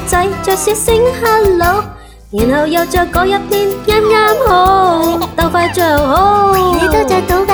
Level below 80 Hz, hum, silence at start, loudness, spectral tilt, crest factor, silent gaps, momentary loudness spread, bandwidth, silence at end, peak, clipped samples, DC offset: -26 dBFS; none; 0 s; -11 LUFS; -4.5 dB/octave; 10 dB; none; 5 LU; over 20 kHz; 0 s; 0 dBFS; under 0.1%; under 0.1%